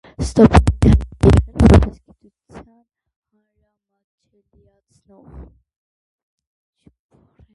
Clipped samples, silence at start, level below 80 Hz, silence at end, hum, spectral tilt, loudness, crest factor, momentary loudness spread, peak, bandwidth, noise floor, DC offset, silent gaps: under 0.1%; 0.2 s; -24 dBFS; 2.1 s; none; -8 dB/octave; -14 LUFS; 18 dB; 5 LU; 0 dBFS; 11.5 kHz; -69 dBFS; under 0.1%; 3.16-3.22 s, 4.04-4.18 s